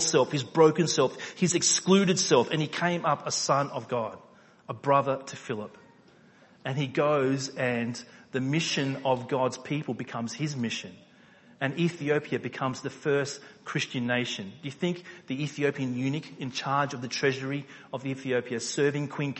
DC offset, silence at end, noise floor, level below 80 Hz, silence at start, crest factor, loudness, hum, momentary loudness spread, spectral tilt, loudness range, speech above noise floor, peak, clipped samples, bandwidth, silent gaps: under 0.1%; 0 s; -57 dBFS; -72 dBFS; 0 s; 20 dB; -28 LUFS; none; 13 LU; -4 dB/octave; 6 LU; 29 dB; -8 dBFS; under 0.1%; 8.6 kHz; none